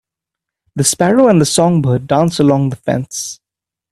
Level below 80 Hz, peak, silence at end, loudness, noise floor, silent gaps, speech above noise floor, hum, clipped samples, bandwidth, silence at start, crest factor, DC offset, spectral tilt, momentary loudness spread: -50 dBFS; 0 dBFS; 0.6 s; -13 LUFS; -86 dBFS; none; 73 dB; none; under 0.1%; 14 kHz; 0.75 s; 14 dB; under 0.1%; -5 dB/octave; 13 LU